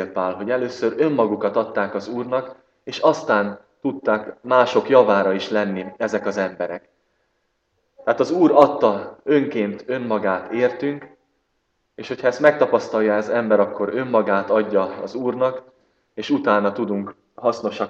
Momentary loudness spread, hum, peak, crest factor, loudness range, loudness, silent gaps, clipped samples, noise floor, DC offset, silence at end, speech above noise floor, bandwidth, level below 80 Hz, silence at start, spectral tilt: 12 LU; none; 0 dBFS; 20 dB; 4 LU; -20 LUFS; none; under 0.1%; -70 dBFS; under 0.1%; 0 s; 51 dB; 7.6 kHz; -68 dBFS; 0 s; -6 dB/octave